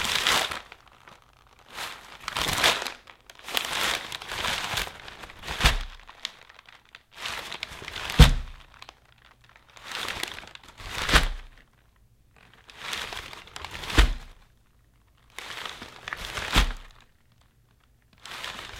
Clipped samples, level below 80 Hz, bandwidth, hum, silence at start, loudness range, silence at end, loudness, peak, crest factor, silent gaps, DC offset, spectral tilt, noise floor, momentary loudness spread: under 0.1%; -32 dBFS; 17 kHz; none; 0 s; 5 LU; 0 s; -27 LUFS; 0 dBFS; 28 dB; none; under 0.1%; -3 dB/octave; -62 dBFS; 23 LU